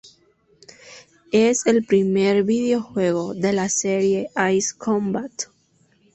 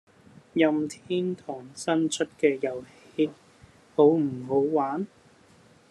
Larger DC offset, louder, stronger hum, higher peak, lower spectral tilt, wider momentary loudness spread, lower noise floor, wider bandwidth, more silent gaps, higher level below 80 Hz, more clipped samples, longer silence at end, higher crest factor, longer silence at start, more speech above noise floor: neither; first, -20 LUFS vs -26 LUFS; neither; first, -4 dBFS vs -8 dBFS; about the same, -4.5 dB/octave vs -5.5 dB/octave; second, 7 LU vs 14 LU; first, -61 dBFS vs -57 dBFS; second, 8.4 kHz vs 11.5 kHz; neither; first, -62 dBFS vs -72 dBFS; neither; second, 0.7 s vs 0.85 s; about the same, 16 dB vs 20 dB; first, 0.85 s vs 0.55 s; first, 41 dB vs 31 dB